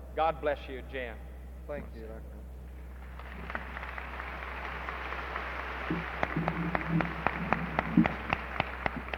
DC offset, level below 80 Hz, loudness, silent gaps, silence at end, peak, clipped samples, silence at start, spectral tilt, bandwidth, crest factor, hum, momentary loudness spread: under 0.1%; -44 dBFS; -34 LUFS; none; 0 s; -6 dBFS; under 0.1%; 0 s; -7.5 dB/octave; 17 kHz; 28 dB; none; 16 LU